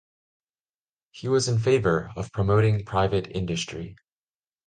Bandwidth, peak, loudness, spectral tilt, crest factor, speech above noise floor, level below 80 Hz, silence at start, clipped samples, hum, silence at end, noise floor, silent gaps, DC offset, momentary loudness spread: 9.4 kHz; -8 dBFS; -24 LUFS; -6 dB/octave; 18 dB; over 66 dB; -46 dBFS; 1.15 s; under 0.1%; none; 0.75 s; under -90 dBFS; none; under 0.1%; 12 LU